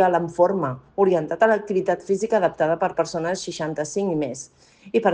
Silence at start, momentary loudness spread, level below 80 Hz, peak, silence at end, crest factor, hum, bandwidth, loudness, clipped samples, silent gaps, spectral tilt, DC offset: 0 s; 8 LU; -60 dBFS; -4 dBFS; 0 s; 18 dB; none; 9.8 kHz; -22 LUFS; under 0.1%; none; -5.5 dB/octave; under 0.1%